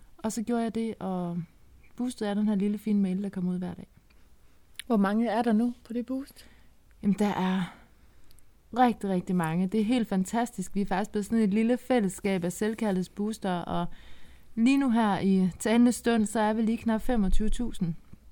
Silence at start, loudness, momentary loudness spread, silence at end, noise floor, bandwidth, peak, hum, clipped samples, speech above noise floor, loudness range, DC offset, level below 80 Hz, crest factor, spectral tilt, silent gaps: 0.15 s; -28 LUFS; 10 LU; 0 s; -56 dBFS; 18.5 kHz; -10 dBFS; none; under 0.1%; 29 dB; 5 LU; under 0.1%; -40 dBFS; 18 dB; -6.5 dB/octave; none